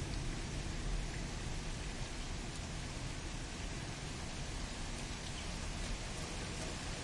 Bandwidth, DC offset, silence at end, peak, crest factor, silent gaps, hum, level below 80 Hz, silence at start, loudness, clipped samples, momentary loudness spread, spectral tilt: 11.5 kHz; under 0.1%; 0 s; -28 dBFS; 14 dB; none; none; -46 dBFS; 0 s; -43 LUFS; under 0.1%; 2 LU; -4 dB/octave